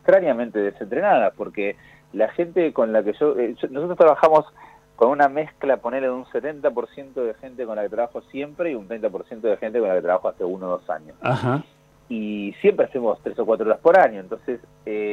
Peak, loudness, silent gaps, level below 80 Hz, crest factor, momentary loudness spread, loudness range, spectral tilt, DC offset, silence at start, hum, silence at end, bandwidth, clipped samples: -4 dBFS; -22 LUFS; none; -62 dBFS; 18 dB; 14 LU; 6 LU; -8 dB/octave; under 0.1%; 0.05 s; none; 0 s; 7.4 kHz; under 0.1%